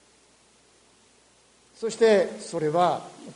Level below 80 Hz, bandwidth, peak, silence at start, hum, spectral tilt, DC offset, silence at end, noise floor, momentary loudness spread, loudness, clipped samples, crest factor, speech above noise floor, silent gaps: -72 dBFS; 10.5 kHz; -8 dBFS; 1.8 s; none; -5 dB/octave; under 0.1%; 0.05 s; -60 dBFS; 13 LU; -24 LUFS; under 0.1%; 18 dB; 36 dB; none